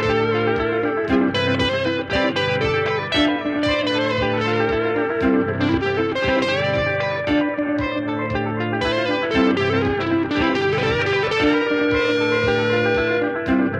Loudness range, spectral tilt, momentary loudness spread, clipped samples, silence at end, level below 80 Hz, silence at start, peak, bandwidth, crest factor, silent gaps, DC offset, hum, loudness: 2 LU; -6 dB/octave; 3 LU; under 0.1%; 0 s; -42 dBFS; 0 s; -6 dBFS; 9.6 kHz; 14 dB; none; under 0.1%; none; -20 LUFS